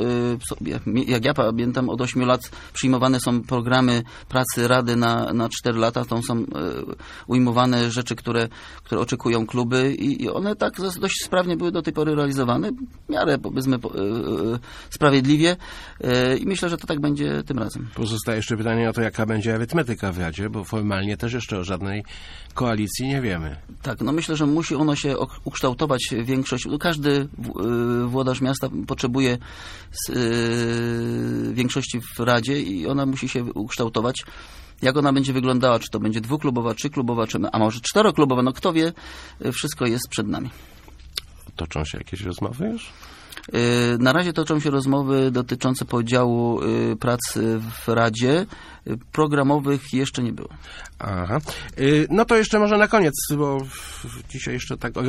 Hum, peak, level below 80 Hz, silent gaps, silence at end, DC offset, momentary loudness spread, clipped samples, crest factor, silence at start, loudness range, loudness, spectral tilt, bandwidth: none; -2 dBFS; -44 dBFS; none; 0 s; under 0.1%; 12 LU; under 0.1%; 20 dB; 0 s; 4 LU; -22 LUFS; -5.5 dB/octave; 15.5 kHz